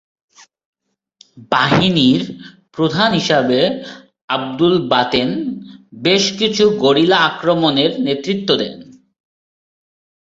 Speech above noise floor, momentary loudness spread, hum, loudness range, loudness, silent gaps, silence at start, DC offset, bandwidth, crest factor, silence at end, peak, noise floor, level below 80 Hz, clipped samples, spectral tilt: 37 dB; 13 LU; none; 2 LU; -15 LUFS; 4.24-4.28 s; 1.35 s; under 0.1%; 7.8 kHz; 16 dB; 1.5 s; 0 dBFS; -52 dBFS; -52 dBFS; under 0.1%; -5 dB/octave